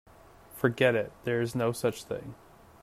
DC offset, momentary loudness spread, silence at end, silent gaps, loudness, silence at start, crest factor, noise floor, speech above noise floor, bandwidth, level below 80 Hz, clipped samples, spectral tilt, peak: under 0.1%; 13 LU; 0.5 s; none; -30 LUFS; 0.5 s; 20 dB; -53 dBFS; 24 dB; 15.5 kHz; -62 dBFS; under 0.1%; -5.5 dB/octave; -10 dBFS